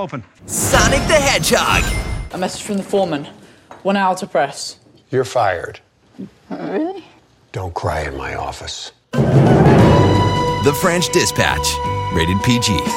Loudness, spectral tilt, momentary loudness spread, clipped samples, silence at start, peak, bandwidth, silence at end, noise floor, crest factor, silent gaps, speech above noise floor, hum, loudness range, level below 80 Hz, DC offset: -16 LUFS; -4.5 dB/octave; 17 LU; under 0.1%; 0 s; -2 dBFS; 16.5 kHz; 0 s; -47 dBFS; 16 dB; none; 30 dB; none; 10 LU; -32 dBFS; under 0.1%